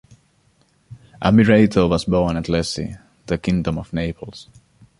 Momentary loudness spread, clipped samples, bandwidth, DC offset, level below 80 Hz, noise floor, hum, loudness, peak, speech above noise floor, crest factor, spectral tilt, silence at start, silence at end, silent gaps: 17 LU; under 0.1%; 11.5 kHz; under 0.1%; -38 dBFS; -60 dBFS; none; -19 LUFS; -2 dBFS; 42 dB; 18 dB; -6.5 dB/octave; 0.9 s; 0.6 s; none